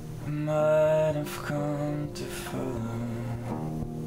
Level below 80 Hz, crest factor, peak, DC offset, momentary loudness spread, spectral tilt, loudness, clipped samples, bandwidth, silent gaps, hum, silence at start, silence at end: -48 dBFS; 14 dB; -14 dBFS; under 0.1%; 11 LU; -7 dB/octave; -29 LUFS; under 0.1%; 16 kHz; none; none; 0 s; 0 s